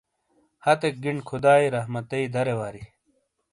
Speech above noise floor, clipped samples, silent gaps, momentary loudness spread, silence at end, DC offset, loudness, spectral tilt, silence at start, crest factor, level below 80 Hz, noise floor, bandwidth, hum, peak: 47 dB; under 0.1%; none; 12 LU; 0.65 s; under 0.1%; -24 LUFS; -6 dB/octave; 0.65 s; 20 dB; -62 dBFS; -70 dBFS; 11.5 kHz; none; -6 dBFS